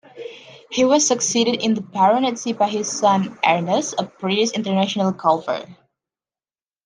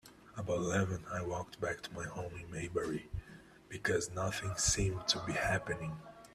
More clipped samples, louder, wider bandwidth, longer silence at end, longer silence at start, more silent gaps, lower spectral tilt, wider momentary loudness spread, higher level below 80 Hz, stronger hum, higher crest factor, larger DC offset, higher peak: neither; first, -19 LUFS vs -36 LUFS; second, 10.5 kHz vs 14 kHz; first, 1.1 s vs 0 s; about the same, 0.15 s vs 0.05 s; neither; about the same, -3.5 dB/octave vs -3.5 dB/octave; second, 10 LU vs 13 LU; second, -68 dBFS vs -54 dBFS; neither; about the same, 18 dB vs 22 dB; neither; first, -2 dBFS vs -14 dBFS